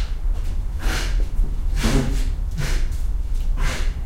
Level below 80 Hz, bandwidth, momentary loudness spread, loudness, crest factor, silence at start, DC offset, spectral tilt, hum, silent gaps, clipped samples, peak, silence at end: -20 dBFS; 14.5 kHz; 6 LU; -26 LUFS; 14 dB; 0 s; 0.9%; -5 dB/octave; none; none; under 0.1%; -6 dBFS; 0 s